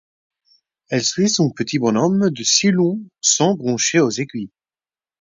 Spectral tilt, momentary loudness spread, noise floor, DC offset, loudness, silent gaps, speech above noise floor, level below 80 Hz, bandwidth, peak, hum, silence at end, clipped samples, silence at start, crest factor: -3.5 dB/octave; 9 LU; under -90 dBFS; under 0.1%; -17 LUFS; none; over 72 dB; -62 dBFS; 7.8 kHz; -2 dBFS; none; 0.75 s; under 0.1%; 0.9 s; 16 dB